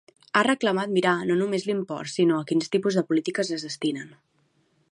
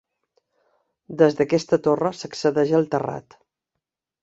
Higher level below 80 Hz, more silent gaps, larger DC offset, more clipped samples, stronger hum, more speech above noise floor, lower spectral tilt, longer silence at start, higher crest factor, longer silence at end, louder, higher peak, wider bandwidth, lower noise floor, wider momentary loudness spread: second, -74 dBFS vs -64 dBFS; neither; neither; neither; neither; second, 43 dB vs 63 dB; second, -5 dB/octave vs -6.5 dB/octave; second, 0.35 s vs 1.1 s; about the same, 20 dB vs 20 dB; second, 0.85 s vs 1 s; second, -25 LUFS vs -21 LUFS; about the same, -4 dBFS vs -2 dBFS; first, 11 kHz vs 8 kHz; second, -67 dBFS vs -83 dBFS; second, 7 LU vs 11 LU